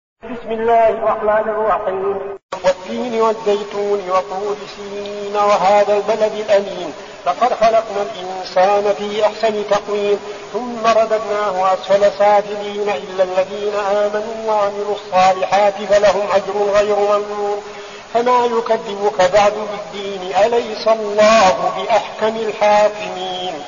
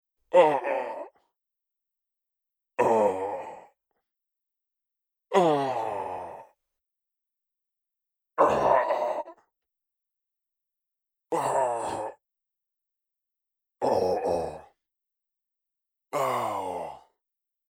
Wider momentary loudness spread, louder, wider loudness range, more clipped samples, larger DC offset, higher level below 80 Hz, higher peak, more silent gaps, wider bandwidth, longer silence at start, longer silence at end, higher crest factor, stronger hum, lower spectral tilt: second, 12 LU vs 16 LU; first, -16 LUFS vs -26 LUFS; about the same, 3 LU vs 5 LU; neither; first, 0.2% vs under 0.1%; first, -52 dBFS vs -66 dBFS; first, -2 dBFS vs -6 dBFS; first, 2.43-2.49 s vs none; second, 7.4 kHz vs 16.5 kHz; about the same, 0.25 s vs 0.3 s; second, 0 s vs 0.7 s; second, 14 dB vs 24 dB; neither; second, -2 dB/octave vs -5 dB/octave